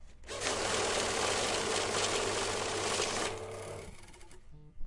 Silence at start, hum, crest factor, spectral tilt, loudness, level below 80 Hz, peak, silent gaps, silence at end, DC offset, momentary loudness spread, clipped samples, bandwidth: 0 s; none; 18 dB; -2 dB/octave; -32 LUFS; -52 dBFS; -16 dBFS; none; 0 s; under 0.1%; 13 LU; under 0.1%; 11.5 kHz